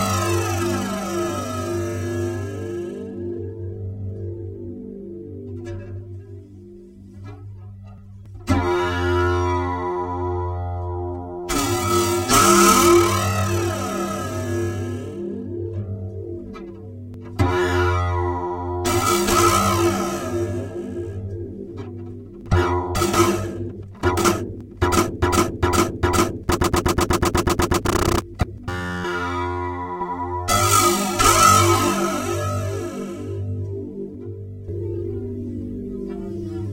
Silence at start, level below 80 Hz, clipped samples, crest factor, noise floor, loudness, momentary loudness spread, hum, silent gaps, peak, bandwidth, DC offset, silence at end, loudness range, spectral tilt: 0 s; -38 dBFS; under 0.1%; 22 dB; -42 dBFS; -21 LUFS; 18 LU; none; none; 0 dBFS; 16.5 kHz; under 0.1%; 0 s; 13 LU; -4.5 dB/octave